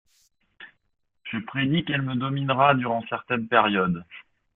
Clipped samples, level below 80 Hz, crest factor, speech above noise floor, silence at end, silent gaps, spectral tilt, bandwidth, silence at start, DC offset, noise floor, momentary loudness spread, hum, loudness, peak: under 0.1%; -62 dBFS; 22 dB; 49 dB; 0.35 s; none; -8.5 dB/octave; 4.1 kHz; 0.6 s; under 0.1%; -72 dBFS; 13 LU; none; -24 LUFS; -4 dBFS